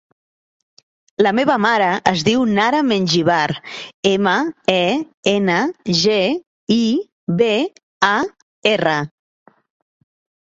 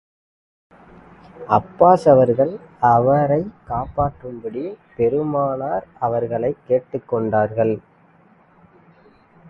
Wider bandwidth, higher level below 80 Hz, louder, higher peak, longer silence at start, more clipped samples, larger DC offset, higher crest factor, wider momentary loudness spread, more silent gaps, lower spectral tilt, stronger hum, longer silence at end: about the same, 8 kHz vs 8.4 kHz; second, -58 dBFS vs -48 dBFS; about the same, -17 LUFS vs -19 LUFS; about the same, -2 dBFS vs 0 dBFS; second, 1.2 s vs 1.35 s; neither; neither; about the same, 18 dB vs 20 dB; second, 7 LU vs 15 LU; first, 3.94-4.03 s, 5.14-5.23 s, 6.47-6.67 s, 7.12-7.27 s, 7.83-8.01 s, 8.42-8.62 s vs none; second, -5 dB/octave vs -9.5 dB/octave; neither; second, 1.35 s vs 1.7 s